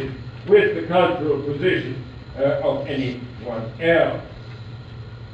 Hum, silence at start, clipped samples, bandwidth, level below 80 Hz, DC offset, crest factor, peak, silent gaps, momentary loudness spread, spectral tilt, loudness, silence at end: none; 0 s; under 0.1%; 7.8 kHz; -46 dBFS; under 0.1%; 18 dB; -4 dBFS; none; 20 LU; -8 dB/octave; -21 LUFS; 0 s